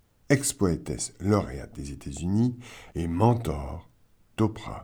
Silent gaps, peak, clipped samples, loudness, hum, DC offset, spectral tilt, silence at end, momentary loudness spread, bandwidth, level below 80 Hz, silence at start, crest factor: none; -8 dBFS; under 0.1%; -27 LUFS; none; under 0.1%; -6 dB/octave; 0 s; 15 LU; over 20 kHz; -44 dBFS; 0.3 s; 20 dB